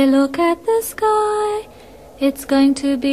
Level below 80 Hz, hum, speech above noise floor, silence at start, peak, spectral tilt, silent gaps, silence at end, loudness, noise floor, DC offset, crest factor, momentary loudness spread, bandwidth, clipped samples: -50 dBFS; none; 25 dB; 0 s; -4 dBFS; -4 dB/octave; none; 0 s; -18 LUFS; -41 dBFS; 0.2%; 14 dB; 6 LU; 15 kHz; under 0.1%